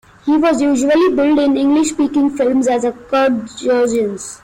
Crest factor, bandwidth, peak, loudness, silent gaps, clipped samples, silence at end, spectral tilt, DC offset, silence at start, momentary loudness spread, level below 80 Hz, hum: 8 dB; 11.5 kHz; -6 dBFS; -15 LUFS; none; under 0.1%; 0.05 s; -4 dB/octave; under 0.1%; 0.25 s; 5 LU; -50 dBFS; none